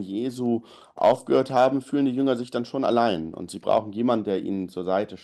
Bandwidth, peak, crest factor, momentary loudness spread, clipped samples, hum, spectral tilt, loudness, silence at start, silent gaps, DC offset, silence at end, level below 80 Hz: 12.5 kHz; -8 dBFS; 16 dB; 9 LU; under 0.1%; none; -6.5 dB/octave; -24 LUFS; 0 s; none; under 0.1%; 0.05 s; -64 dBFS